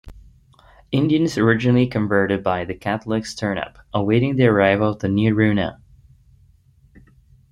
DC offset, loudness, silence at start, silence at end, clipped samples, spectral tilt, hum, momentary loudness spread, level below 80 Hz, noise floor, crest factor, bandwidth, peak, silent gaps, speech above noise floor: under 0.1%; -19 LUFS; 0.05 s; 1.8 s; under 0.1%; -7 dB/octave; none; 9 LU; -48 dBFS; -54 dBFS; 18 dB; 11.5 kHz; -2 dBFS; none; 35 dB